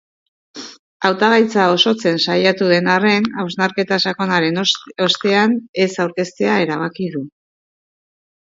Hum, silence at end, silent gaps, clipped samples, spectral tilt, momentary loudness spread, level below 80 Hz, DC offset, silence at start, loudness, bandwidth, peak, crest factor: none; 1.25 s; 0.79-1.00 s, 5.69-5.73 s; under 0.1%; -4.5 dB/octave; 11 LU; -64 dBFS; under 0.1%; 0.55 s; -16 LUFS; 7.8 kHz; 0 dBFS; 18 dB